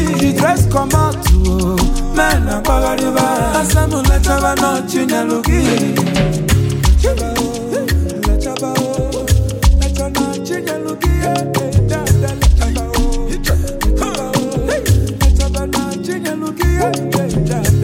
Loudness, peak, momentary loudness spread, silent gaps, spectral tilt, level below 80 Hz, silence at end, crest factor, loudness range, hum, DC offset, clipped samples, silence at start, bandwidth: -15 LUFS; 0 dBFS; 5 LU; none; -5.5 dB/octave; -18 dBFS; 0 s; 12 dB; 2 LU; none; under 0.1%; under 0.1%; 0 s; 17 kHz